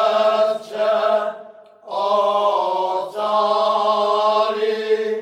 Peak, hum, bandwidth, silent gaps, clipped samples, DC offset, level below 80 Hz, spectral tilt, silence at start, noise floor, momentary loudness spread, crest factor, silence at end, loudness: -6 dBFS; none; 11 kHz; none; under 0.1%; under 0.1%; -78 dBFS; -3.5 dB/octave; 0 s; -41 dBFS; 6 LU; 14 dB; 0 s; -19 LUFS